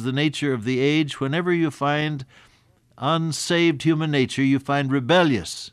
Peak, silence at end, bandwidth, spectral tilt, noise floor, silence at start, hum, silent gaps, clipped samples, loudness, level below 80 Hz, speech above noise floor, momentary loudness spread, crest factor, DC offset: -6 dBFS; 0.05 s; 13 kHz; -5.5 dB/octave; -58 dBFS; 0 s; none; none; under 0.1%; -22 LUFS; -62 dBFS; 37 dB; 6 LU; 16 dB; under 0.1%